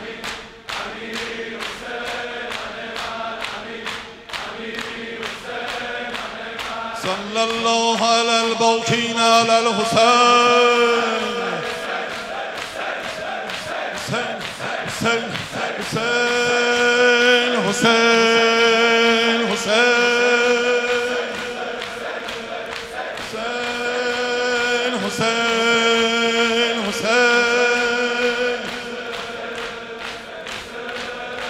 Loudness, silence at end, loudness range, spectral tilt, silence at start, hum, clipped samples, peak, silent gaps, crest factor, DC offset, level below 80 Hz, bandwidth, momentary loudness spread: -19 LUFS; 0 s; 12 LU; -2.5 dB/octave; 0 s; none; under 0.1%; -2 dBFS; none; 18 dB; under 0.1%; -56 dBFS; 15 kHz; 14 LU